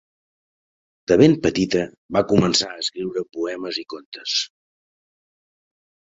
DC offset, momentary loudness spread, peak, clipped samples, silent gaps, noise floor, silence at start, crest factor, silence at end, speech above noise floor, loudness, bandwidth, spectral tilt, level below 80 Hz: under 0.1%; 14 LU; -2 dBFS; under 0.1%; 1.98-2.09 s, 4.06-4.12 s; under -90 dBFS; 1.1 s; 22 dB; 1.65 s; over 70 dB; -20 LUFS; 8 kHz; -4.5 dB/octave; -52 dBFS